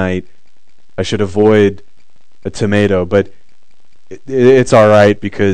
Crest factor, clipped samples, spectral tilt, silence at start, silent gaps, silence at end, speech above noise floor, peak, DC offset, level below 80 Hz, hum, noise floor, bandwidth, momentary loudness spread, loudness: 14 dB; 0.8%; -6.5 dB/octave; 0 s; none; 0 s; 46 dB; 0 dBFS; 4%; -44 dBFS; none; -57 dBFS; 9.8 kHz; 16 LU; -11 LUFS